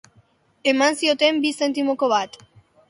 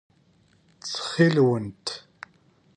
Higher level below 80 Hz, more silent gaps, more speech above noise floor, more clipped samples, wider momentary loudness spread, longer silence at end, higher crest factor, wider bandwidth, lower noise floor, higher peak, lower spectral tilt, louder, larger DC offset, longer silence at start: second, -70 dBFS vs -64 dBFS; neither; about the same, 39 dB vs 39 dB; neither; second, 5 LU vs 26 LU; second, 0.6 s vs 0.8 s; about the same, 18 dB vs 20 dB; first, 11.5 kHz vs 10 kHz; about the same, -59 dBFS vs -61 dBFS; about the same, -4 dBFS vs -6 dBFS; second, -2 dB/octave vs -6 dB/octave; first, -20 LUFS vs -24 LUFS; neither; second, 0.65 s vs 0.85 s